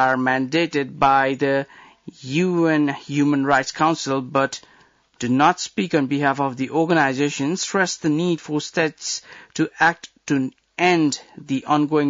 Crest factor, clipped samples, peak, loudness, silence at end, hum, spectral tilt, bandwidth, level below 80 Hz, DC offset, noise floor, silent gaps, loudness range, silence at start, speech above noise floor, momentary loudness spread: 16 dB; under 0.1%; -6 dBFS; -20 LUFS; 0 s; none; -4.5 dB/octave; 7.8 kHz; -62 dBFS; under 0.1%; -50 dBFS; none; 2 LU; 0 s; 30 dB; 10 LU